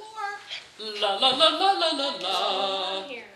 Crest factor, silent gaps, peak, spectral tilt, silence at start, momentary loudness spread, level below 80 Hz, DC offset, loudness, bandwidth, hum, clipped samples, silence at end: 20 dB; none; -6 dBFS; -1.5 dB/octave; 0 s; 16 LU; -76 dBFS; under 0.1%; -24 LUFS; 13 kHz; none; under 0.1%; 0 s